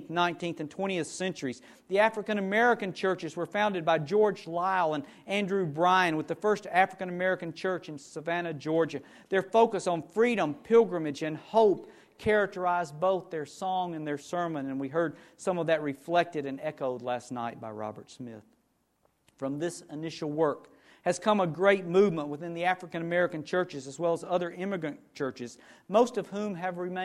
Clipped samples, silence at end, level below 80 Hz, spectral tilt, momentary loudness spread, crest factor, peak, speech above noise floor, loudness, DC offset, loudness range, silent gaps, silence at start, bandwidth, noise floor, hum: under 0.1%; 0 s; -70 dBFS; -5.5 dB/octave; 12 LU; 20 dB; -10 dBFS; 43 dB; -29 LUFS; under 0.1%; 7 LU; none; 0 s; 13 kHz; -73 dBFS; none